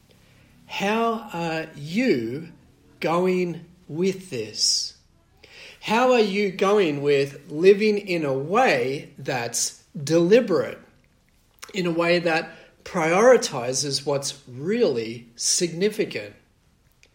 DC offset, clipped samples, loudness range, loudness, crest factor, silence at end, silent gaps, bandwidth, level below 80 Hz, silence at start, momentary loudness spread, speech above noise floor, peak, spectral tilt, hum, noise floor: under 0.1%; under 0.1%; 5 LU; -22 LUFS; 18 dB; 0.8 s; none; 16.5 kHz; -64 dBFS; 0.7 s; 15 LU; 39 dB; -4 dBFS; -4 dB/octave; none; -61 dBFS